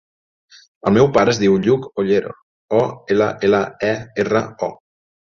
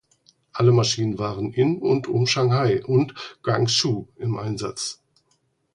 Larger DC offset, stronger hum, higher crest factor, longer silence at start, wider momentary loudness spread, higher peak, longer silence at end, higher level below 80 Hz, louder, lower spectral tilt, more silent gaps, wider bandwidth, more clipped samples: neither; neither; about the same, 16 dB vs 16 dB; first, 0.85 s vs 0.55 s; about the same, 10 LU vs 10 LU; first, -2 dBFS vs -6 dBFS; second, 0.65 s vs 0.8 s; about the same, -52 dBFS vs -56 dBFS; first, -18 LUFS vs -22 LUFS; about the same, -6 dB/octave vs -5.5 dB/octave; first, 2.42-2.68 s vs none; second, 7.4 kHz vs 11 kHz; neither